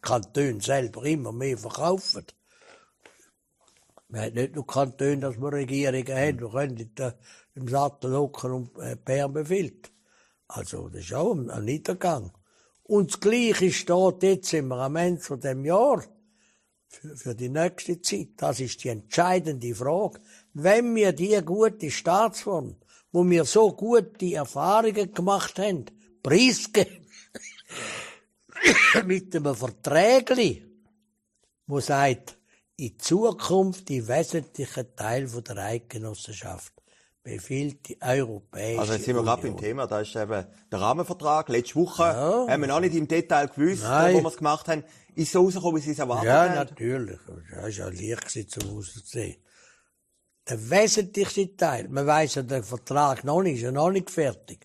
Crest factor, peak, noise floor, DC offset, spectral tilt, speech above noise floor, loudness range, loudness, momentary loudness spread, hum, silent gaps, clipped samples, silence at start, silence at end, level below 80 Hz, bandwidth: 22 dB; -4 dBFS; -73 dBFS; under 0.1%; -4.5 dB/octave; 48 dB; 8 LU; -25 LUFS; 15 LU; none; none; under 0.1%; 0.05 s; 0.1 s; -62 dBFS; 14 kHz